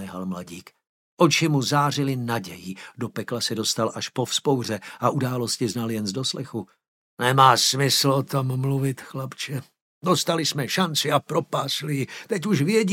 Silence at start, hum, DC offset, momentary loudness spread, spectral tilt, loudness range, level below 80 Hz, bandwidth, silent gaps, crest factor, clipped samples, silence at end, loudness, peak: 0 s; none; under 0.1%; 14 LU; -4 dB/octave; 4 LU; -68 dBFS; 17 kHz; 0.89-1.17 s, 6.88-7.17 s, 9.82-10.01 s; 22 dB; under 0.1%; 0 s; -23 LUFS; -2 dBFS